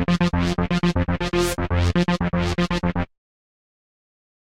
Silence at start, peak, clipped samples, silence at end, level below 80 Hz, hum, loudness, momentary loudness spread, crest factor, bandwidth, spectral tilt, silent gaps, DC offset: 0 s; -8 dBFS; under 0.1%; 1.4 s; -36 dBFS; none; -22 LUFS; 3 LU; 14 dB; 15.5 kHz; -6 dB/octave; none; under 0.1%